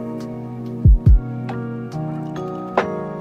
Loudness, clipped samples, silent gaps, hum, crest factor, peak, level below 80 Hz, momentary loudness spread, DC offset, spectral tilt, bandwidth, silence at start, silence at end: -21 LUFS; under 0.1%; none; none; 16 dB; -2 dBFS; -22 dBFS; 14 LU; under 0.1%; -9 dB/octave; 6.4 kHz; 0 s; 0 s